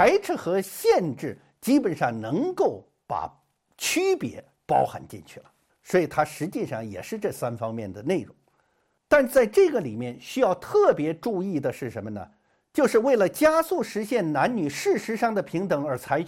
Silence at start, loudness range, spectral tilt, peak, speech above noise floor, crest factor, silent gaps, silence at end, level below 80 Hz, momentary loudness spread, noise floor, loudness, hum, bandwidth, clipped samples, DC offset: 0 s; 6 LU; -5 dB/octave; -6 dBFS; 46 dB; 18 dB; none; 0 s; -60 dBFS; 14 LU; -70 dBFS; -25 LUFS; none; 16.5 kHz; under 0.1%; under 0.1%